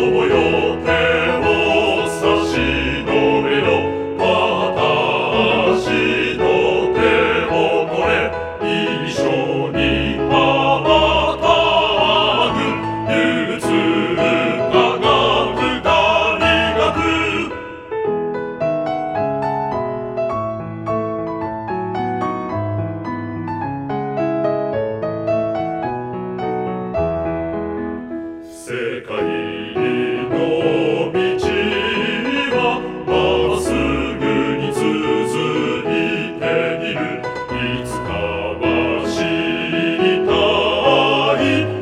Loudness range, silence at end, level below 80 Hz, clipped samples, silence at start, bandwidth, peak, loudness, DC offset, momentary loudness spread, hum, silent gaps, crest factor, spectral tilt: 7 LU; 0 s; -38 dBFS; under 0.1%; 0 s; 13 kHz; 0 dBFS; -17 LUFS; under 0.1%; 9 LU; none; none; 16 dB; -5.5 dB/octave